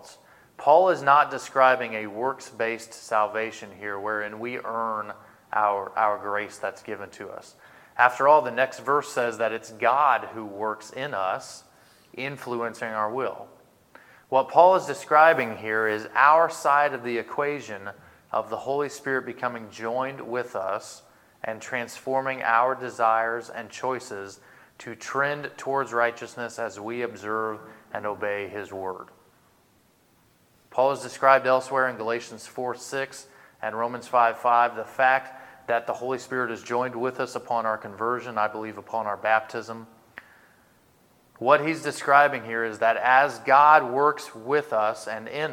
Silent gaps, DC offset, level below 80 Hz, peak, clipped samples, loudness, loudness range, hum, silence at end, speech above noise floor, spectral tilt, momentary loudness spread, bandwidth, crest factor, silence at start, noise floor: none; under 0.1%; -76 dBFS; -2 dBFS; under 0.1%; -24 LUFS; 10 LU; none; 0 s; 37 dB; -4 dB/octave; 16 LU; 16.5 kHz; 24 dB; 0.05 s; -62 dBFS